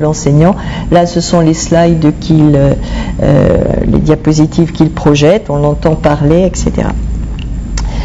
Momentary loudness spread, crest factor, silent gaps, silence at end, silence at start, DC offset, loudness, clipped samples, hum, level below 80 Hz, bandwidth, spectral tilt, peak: 10 LU; 10 dB; none; 0 s; 0 s; under 0.1%; -10 LUFS; 3%; none; -20 dBFS; 8 kHz; -6.5 dB/octave; 0 dBFS